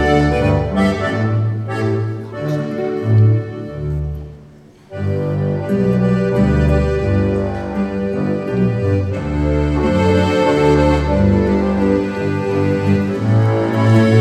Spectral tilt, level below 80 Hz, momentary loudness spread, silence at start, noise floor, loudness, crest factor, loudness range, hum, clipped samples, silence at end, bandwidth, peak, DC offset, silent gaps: -8 dB/octave; -28 dBFS; 9 LU; 0 s; -42 dBFS; -16 LUFS; 14 dB; 4 LU; none; under 0.1%; 0 s; 9.2 kHz; 0 dBFS; under 0.1%; none